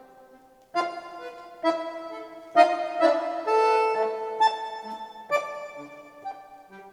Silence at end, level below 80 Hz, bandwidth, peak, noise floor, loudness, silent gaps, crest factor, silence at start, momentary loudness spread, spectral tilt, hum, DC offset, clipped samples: 0 s; -76 dBFS; 12.5 kHz; -4 dBFS; -54 dBFS; -25 LUFS; none; 24 dB; 0.75 s; 19 LU; -3 dB/octave; none; under 0.1%; under 0.1%